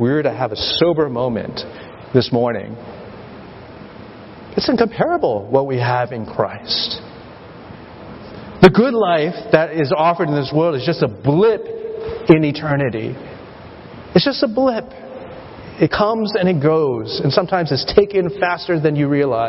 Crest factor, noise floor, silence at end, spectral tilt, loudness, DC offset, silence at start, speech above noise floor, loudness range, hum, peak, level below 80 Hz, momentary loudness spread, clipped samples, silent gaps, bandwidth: 18 dB; -37 dBFS; 0 s; -8 dB/octave; -17 LUFS; under 0.1%; 0 s; 20 dB; 6 LU; none; 0 dBFS; -46 dBFS; 22 LU; under 0.1%; none; 8 kHz